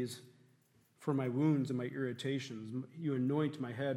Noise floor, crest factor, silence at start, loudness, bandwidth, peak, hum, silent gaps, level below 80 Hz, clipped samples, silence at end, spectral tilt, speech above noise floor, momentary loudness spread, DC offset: -70 dBFS; 16 dB; 0 s; -37 LUFS; 13.5 kHz; -20 dBFS; none; none; -86 dBFS; under 0.1%; 0 s; -7 dB/octave; 35 dB; 11 LU; under 0.1%